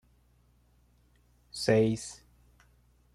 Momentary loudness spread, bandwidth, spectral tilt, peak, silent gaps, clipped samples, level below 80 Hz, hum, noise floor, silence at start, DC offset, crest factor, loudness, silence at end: 20 LU; 13.5 kHz; -5.5 dB/octave; -12 dBFS; none; under 0.1%; -62 dBFS; 60 Hz at -60 dBFS; -66 dBFS; 1.55 s; under 0.1%; 22 dB; -28 LUFS; 1 s